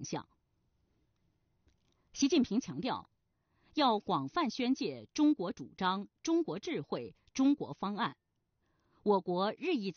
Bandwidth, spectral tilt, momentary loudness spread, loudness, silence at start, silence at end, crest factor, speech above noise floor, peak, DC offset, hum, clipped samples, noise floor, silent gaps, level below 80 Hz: 6.8 kHz; -4 dB/octave; 11 LU; -34 LUFS; 0 s; 0.05 s; 18 dB; 46 dB; -18 dBFS; under 0.1%; none; under 0.1%; -80 dBFS; none; -72 dBFS